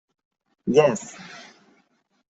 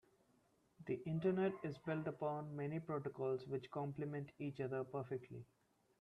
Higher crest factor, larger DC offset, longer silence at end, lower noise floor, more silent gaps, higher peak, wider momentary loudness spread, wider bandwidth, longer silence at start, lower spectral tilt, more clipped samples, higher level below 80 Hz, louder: about the same, 22 dB vs 18 dB; neither; first, 0.9 s vs 0.55 s; second, -66 dBFS vs -77 dBFS; neither; first, -4 dBFS vs -28 dBFS; first, 23 LU vs 8 LU; first, 8.2 kHz vs 6.2 kHz; second, 0.65 s vs 0.8 s; second, -5.5 dB/octave vs -9 dB/octave; neither; first, -68 dBFS vs -78 dBFS; first, -22 LUFS vs -44 LUFS